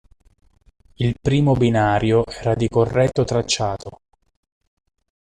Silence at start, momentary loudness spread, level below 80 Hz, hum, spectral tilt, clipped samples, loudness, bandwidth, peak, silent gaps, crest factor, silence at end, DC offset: 1 s; 8 LU; -42 dBFS; none; -6 dB/octave; under 0.1%; -19 LUFS; 10 kHz; -4 dBFS; none; 16 dB; 1.35 s; under 0.1%